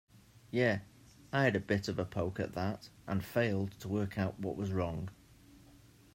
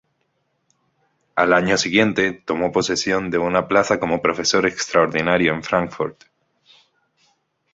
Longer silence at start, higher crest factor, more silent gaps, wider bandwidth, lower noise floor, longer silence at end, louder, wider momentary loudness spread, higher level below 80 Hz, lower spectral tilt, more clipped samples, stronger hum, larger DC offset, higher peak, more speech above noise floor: second, 0.15 s vs 1.35 s; about the same, 20 dB vs 20 dB; neither; first, 16 kHz vs 8 kHz; second, -60 dBFS vs -69 dBFS; second, 0.4 s vs 1.6 s; second, -35 LUFS vs -19 LUFS; first, 8 LU vs 5 LU; second, -62 dBFS vs -52 dBFS; first, -7 dB/octave vs -4 dB/octave; neither; neither; neither; second, -16 dBFS vs -2 dBFS; second, 26 dB vs 51 dB